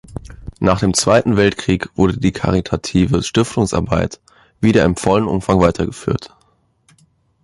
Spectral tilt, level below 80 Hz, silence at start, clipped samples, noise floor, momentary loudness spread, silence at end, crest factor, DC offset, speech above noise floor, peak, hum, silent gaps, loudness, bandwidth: -5.5 dB/octave; -34 dBFS; 0.1 s; under 0.1%; -59 dBFS; 9 LU; 1.15 s; 16 dB; under 0.1%; 44 dB; 0 dBFS; none; none; -16 LUFS; 11.5 kHz